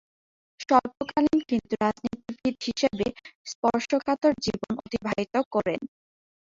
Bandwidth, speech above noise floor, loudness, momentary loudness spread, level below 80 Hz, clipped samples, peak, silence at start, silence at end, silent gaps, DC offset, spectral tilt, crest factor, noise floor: 7.8 kHz; over 64 dB; -27 LUFS; 11 LU; -58 dBFS; under 0.1%; -6 dBFS; 0.6 s; 0.7 s; 3.35-3.45 s, 3.55-3.63 s, 5.46-5.51 s; under 0.1%; -5 dB/octave; 22 dB; under -90 dBFS